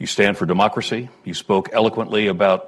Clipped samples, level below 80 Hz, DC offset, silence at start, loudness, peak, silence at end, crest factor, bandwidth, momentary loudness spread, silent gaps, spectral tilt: under 0.1%; -54 dBFS; under 0.1%; 0 s; -19 LUFS; -4 dBFS; 0 s; 16 dB; 12.5 kHz; 10 LU; none; -5 dB/octave